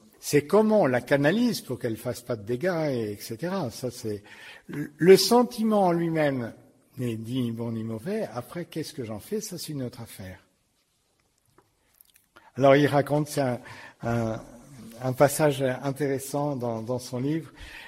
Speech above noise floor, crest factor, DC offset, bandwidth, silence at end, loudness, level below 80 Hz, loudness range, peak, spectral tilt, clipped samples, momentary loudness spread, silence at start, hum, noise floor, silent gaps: 45 dB; 22 dB; under 0.1%; 16 kHz; 0 s; -26 LUFS; -60 dBFS; 12 LU; -4 dBFS; -5.5 dB/octave; under 0.1%; 16 LU; 0.2 s; none; -70 dBFS; none